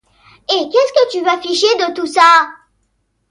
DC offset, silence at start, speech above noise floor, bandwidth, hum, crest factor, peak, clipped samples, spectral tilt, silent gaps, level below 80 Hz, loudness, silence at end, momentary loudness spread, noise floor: under 0.1%; 0.5 s; 52 dB; 11.5 kHz; none; 14 dB; 0 dBFS; under 0.1%; -1 dB/octave; none; -62 dBFS; -13 LUFS; 0.75 s; 9 LU; -65 dBFS